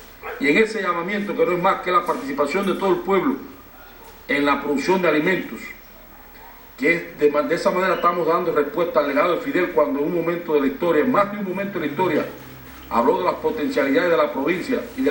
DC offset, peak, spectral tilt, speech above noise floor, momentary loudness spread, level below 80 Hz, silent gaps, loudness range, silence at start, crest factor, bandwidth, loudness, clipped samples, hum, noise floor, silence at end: under 0.1%; -2 dBFS; -6 dB/octave; 23 dB; 13 LU; -52 dBFS; none; 2 LU; 0 s; 18 dB; 16.5 kHz; -20 LUFS; under 0.1%; none; -43 dBFS; 0 s